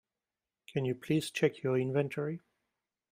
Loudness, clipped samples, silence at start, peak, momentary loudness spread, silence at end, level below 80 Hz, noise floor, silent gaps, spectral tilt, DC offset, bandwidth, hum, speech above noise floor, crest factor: -33 LUFS; under 0.1%; 0.7 s; -14 dBFS; 9 LU; 0.75 s; -72 dBFS; under -90 dBFS; none; -6.5 dB/octave; under 0.1%; 15.5 kHz; none; over 58 dB; 20 dB